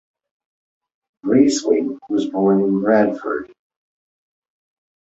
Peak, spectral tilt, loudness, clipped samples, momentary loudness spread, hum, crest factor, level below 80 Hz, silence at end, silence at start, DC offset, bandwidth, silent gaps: -2 dBFS; -5.5 dB/octave; -18 LUFS; under 0.1%; 10 LU; none; 18 dB; -62 dBFS; 1.6 s; 1.25 s; under 0.1%; 8.2 kHz; none